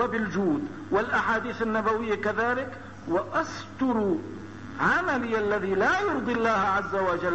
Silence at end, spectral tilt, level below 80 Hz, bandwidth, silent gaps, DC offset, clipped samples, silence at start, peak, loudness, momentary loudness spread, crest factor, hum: 0 s; -6 dB/octave; -54 dBFS; 8.2 kHz; none; 0.3%; under 0.1%; 0 s; -10 dBFS; -26 LUFS; 7 LU; 16 dB; none